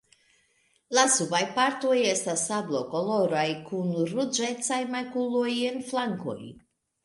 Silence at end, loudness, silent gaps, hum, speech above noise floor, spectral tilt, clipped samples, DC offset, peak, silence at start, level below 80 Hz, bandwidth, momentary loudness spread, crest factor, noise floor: 0.5 s; -27 LUFS; none; none; 41 dB; -3 dB/octave; under 0.1%; under 0.1%; -8 dBFS; 0.9 s; -72 dBFS; 11.5 kHz; 8 LU; 20 dB; -68 dBFS